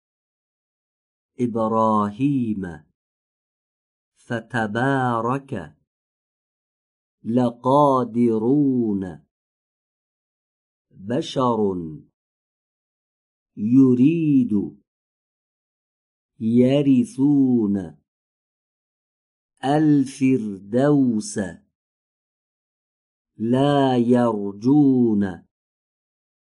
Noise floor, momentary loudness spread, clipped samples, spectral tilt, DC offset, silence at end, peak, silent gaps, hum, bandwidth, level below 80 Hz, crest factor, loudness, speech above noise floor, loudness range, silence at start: under -90 dBFS; 13 LU; under 0.1%; -7.5 dB/octave; under 0.1%; 1.2 s; -6 dBFS; 2.95-4.12 s, 5.87-7.18 s, 9.31-10.85 s, 12.13-13.46 s, 14.87-16.29 s, 18.08-19.49 s, 21.75-23.25 s; none; 11.5 kHz; -62 dBFS; 18 dB; -20 LUFS; over 71 dB; 6 LU; 1.4 s